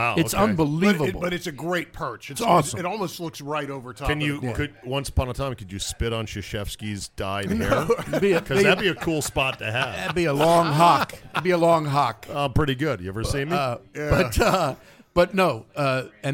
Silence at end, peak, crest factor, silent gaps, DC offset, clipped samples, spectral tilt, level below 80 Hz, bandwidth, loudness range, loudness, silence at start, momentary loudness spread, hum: 0 s; -4 dBFS; 20 dB; none; under 0.1%; under 0.1%; -5 dB/octave; -40 dBFS; 17 kHz; 7 LU; -23 LUFS; 0 s; 11 LU; none